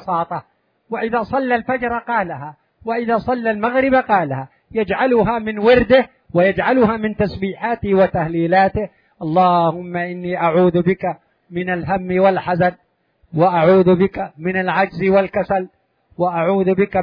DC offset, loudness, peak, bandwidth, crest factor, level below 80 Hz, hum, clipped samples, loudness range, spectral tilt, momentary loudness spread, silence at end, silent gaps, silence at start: under 0.1%; -17 LUFS; -2 dBFS; 5.2 kHz; 16 dB; -46 dBFS; none; under 0.1%; 3 LU; -9.5 dB/octave; 12 LU; 0 s; none; 0 s